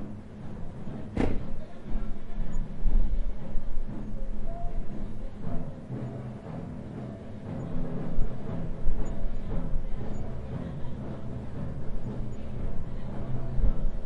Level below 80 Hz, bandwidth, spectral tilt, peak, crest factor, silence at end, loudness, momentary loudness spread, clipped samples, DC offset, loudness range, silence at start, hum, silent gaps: -30 dBFS; 3.4 kHz; -9 dB/octave; -8 dBFS; 16 dB; 0 s; -37 LUFS; 8 LU; under 0.1%; under 0.1%; 3 LU; 0 s; none; none